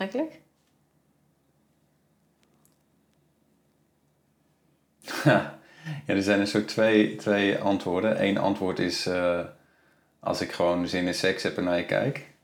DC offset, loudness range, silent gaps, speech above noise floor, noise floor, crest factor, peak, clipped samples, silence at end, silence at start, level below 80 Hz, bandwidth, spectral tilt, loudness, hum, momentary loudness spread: under 0.1%; 7 LU; none; 43 dB; -68 dBFS; 22 dB; -6 dBFS; under 0.1%; 0.15 s; 0 s; -66 dBFS; 19 kHz; -5.5 dB/octave; -26 LUFS; none; 13 LU